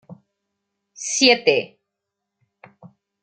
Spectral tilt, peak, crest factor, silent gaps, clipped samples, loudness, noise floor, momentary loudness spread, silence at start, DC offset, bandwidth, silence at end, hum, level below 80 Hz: -1.5 dB/octave; 0 dBFS; 24 dB; none; under 0.1%; -17 LUFS; -81 dBFS; 18 LU; 0.1 s; under 0.1%; 9.4 kHz; 0.35 s; none; -74 dBFS